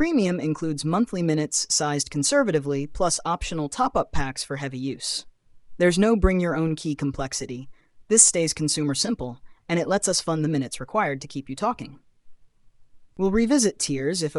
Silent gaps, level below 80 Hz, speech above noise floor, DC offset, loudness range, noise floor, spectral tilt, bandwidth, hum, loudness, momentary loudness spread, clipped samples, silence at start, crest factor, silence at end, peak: none; -40 dBFS; 29 dB; under 0.1%; 5 LU; -52 dBFS; -4 dB/octave; 13.5 kHz; none; -23 LUFS; 10 LU; under 0.1%; 0 s; 22 dB; 0 s; -2 dBFS